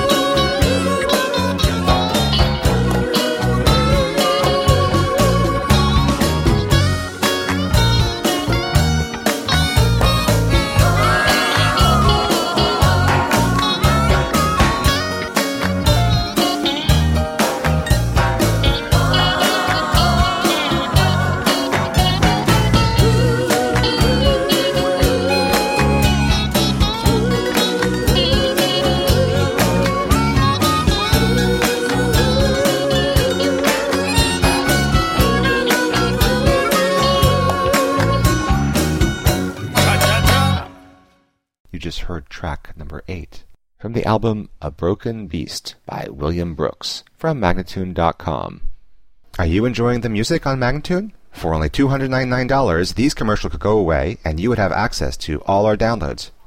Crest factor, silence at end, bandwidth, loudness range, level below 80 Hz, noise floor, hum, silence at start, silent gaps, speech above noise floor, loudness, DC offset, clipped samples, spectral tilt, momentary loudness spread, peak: 16 dB; 0.15 s; 16.5 kHz; 7 LU; -24 dBFS; -61 dBFS; none; 0 s; 41.60-41.65 s; 42 dB; -16 LUFS; under 0.1%; under 0.1%; -5 dB/octave; 9 LU; -2 dBFS